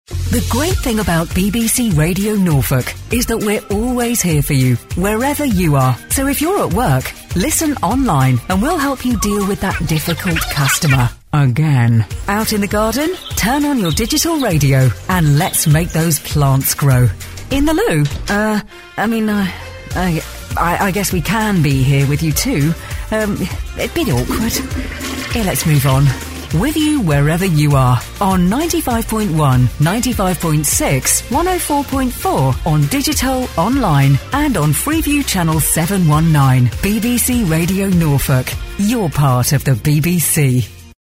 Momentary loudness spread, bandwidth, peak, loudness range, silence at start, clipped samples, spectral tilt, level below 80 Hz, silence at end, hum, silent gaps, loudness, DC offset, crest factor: 6 LU; 16.5 kHz; 0 dBFS; 3 LU; 0.1 s; under 0.1%; -5 dB/octave; -28 dBFS; 0.15 s; none; none; -15 LUFS; under 0.1%; 14 dB